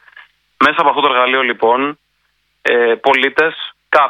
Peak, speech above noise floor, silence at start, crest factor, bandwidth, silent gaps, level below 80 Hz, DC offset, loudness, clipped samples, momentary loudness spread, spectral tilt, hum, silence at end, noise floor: 0 dBFS; 50 dB; 0.6 s; 14 dB; 10.5 kHz; none; -60 dBFS; under 0.1%; -13 LUFS; under 0.1%; 6 LU; -4 dB/octave; none; 0 s; -63 dBFS